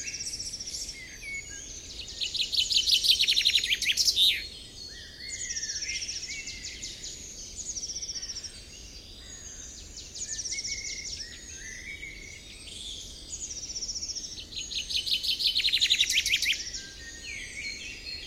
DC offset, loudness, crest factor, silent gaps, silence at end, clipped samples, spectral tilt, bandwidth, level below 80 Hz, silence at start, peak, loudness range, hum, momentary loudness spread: under 0.1%; -27 LUFS; 22 dB; none; 0 s; under 0.1%; 1 dB/octave; 16 kHz; -52 dBFS; 0 s; -10 dBFS; 13 LU; none; 19 LU